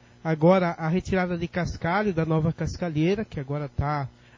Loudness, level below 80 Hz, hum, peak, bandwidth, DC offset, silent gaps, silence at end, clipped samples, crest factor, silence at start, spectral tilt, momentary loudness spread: -26 LUFS; -44 dBFS; none; -6 dBFS; 7.6 kHz; under 0.1%; none; 0.25 s; under 0.1%; 18 dB; 0.25 s; -7.5 dB/octave; 10 LU